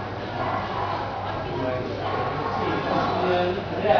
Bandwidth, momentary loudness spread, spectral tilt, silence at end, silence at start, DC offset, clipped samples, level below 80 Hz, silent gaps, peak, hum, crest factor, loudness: 5.4 kHz; 6 LU; -7 dB/octave; 0 s; 0 s; under 0.1%; under 0.1%; -46 dBFS; none; -8 dBFS; none; 18 dB; -26 LUFS